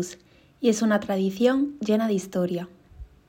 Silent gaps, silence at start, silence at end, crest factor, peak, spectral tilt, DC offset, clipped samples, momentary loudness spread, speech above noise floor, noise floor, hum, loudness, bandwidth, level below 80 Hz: none; 0 s; 0.25 s; 16 dB; -8 dBFS; -5.5 dB/octave; under 0.1%; under 0.1%; 9 LU; 22 dB; -46 dBFS; none; -25 LUFS; 16 kHz; -54 dBFS